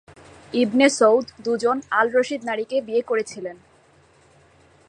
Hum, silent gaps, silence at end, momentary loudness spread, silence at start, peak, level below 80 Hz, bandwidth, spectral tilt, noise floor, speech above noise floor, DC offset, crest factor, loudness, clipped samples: none; none; 1.35 s; 11 LU; 0.55 s; -4 dBFS; -64 dBFS; 11 kHz; -3.5 dB/octave; -55 dBFS; 35 dB; under 0.1%; 20 dB; -21 LUFS; under 0.1%